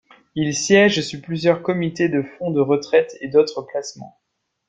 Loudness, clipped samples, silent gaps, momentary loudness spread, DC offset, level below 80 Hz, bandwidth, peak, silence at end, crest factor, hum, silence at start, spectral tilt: -19 LUFS; under 0.1%; none; 14 LU; under 0.1%; -60 dBFS; 9.2 kHz; -2 dBFS; 0.6 s; 18 dB; none; 0.35 s; -4.5 dB/octave